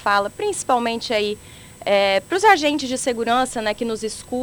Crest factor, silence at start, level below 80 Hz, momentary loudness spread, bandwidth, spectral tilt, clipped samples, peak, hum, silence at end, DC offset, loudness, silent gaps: 20 dB; 0 s; -52 dBFS; 11 LU; over 20 kHz; -2.5 dB/octave; under 0.1%; -2 dBFS; none; 0 s; under 0.1%; -20 LUFS; none